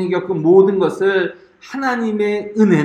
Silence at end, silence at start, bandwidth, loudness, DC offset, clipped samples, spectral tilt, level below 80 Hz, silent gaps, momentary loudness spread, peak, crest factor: 0 s; 0 s; 9.2 kHz; -16 LUFS; under 0.1%; under 0.1%; -7.5 dB/octave; -62 dBFS; none; 10 LU; 0 dBFS; 16 dB